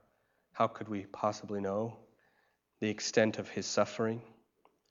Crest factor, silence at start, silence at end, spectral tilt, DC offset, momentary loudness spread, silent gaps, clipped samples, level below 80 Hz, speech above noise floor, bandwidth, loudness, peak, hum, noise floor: 24 dB; 0.55 s; 0.6 s; -4.5 dB/octave; under 0.1%; 11 LU; none; under 0.1%; -80 dBFS; 41 dB; 7.8 kHz; -35 LUFS; -12 dBFS; none; -75 dBFS